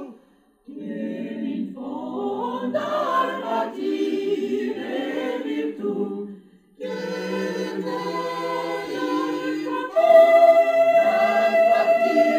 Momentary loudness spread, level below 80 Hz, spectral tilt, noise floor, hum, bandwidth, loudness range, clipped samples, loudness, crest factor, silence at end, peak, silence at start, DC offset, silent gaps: 15 LU; -72 dBFS; -5.5 dB/octave; -58 dBFS; none; 15.5 kHz; 11 LU; under 0.1%; -22 LUFS; 18 dB; 0 s; -4 dBFS; 0 s; under 0.1%; none